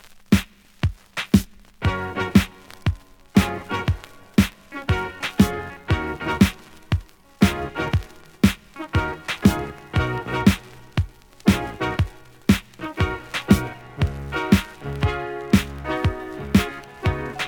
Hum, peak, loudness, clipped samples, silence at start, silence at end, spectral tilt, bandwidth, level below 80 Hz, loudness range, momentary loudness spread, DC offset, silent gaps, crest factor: none; -2 dBFS; -23 LUFS; under 0.1%; 0.05 s; 0 s; -6 dB/octave; over 20 kHz; -36 dBFS; 1 LU; 10 LU; under 0.1%; none; 22 dB